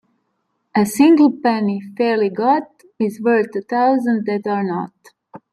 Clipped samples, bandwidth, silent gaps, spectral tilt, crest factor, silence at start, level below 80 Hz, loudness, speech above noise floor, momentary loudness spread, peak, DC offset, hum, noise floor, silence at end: under 0.1%; 13.5 kHz; none; -6 dB/octave; 16 dB; 0.75 s; -66 dBFS; -17 LUFS; 54 dB; 11 LU; -2 dBFS; under 0.1%; none; -70 dBFS; 0.15 s